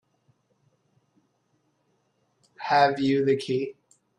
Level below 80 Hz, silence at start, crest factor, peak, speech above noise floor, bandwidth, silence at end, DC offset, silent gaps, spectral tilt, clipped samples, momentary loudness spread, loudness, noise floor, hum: -70 dBFS; 2.6 s; 22 dB; -8 dBFS; 48 dB; 11 kHz; 0.45 s; under 0.1%; none; -6 dB/octave; under 0.1%; 13 LU; -24 LUFS; -71 dBFS; none